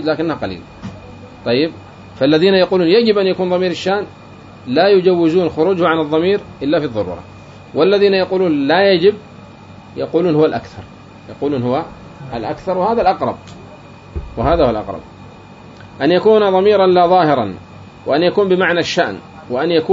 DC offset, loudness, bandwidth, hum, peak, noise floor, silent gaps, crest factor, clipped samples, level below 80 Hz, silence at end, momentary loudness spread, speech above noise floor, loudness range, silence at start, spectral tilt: under 0.1%; -15 LUFS; 7.6 kHz; none; -2 dBFS; -38 dBFS; none; 14 dB; under 0.1%; -40 dBFS; 0 s; 20 LU; 23 dB; 6 LU; 0 s; -6.5 dB/octave